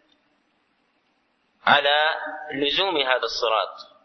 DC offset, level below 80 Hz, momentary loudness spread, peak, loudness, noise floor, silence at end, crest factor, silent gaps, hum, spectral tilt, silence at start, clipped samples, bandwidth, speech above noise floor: under 0.1%; -64 dBFS; 12 LU; -4 dBFS; -22 LUFS; -68 dBFS; 0.2 s; 22 dB; none; none; -2.5 dB/octave; 1.65 s; under 0.1%; 6.4 kHz; 46 dB